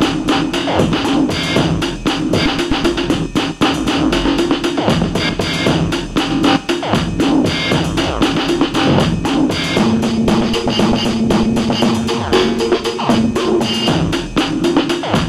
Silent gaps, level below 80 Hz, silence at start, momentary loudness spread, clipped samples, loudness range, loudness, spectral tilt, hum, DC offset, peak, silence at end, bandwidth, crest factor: none; -32 dBFS; 0 s; 3 LU; under 0.1%; 1 LU; -15 LUFS; -5 dB/octave; none; under 0.1%; 0 dBFS; 0 s; 15.5 kHz; 14 dB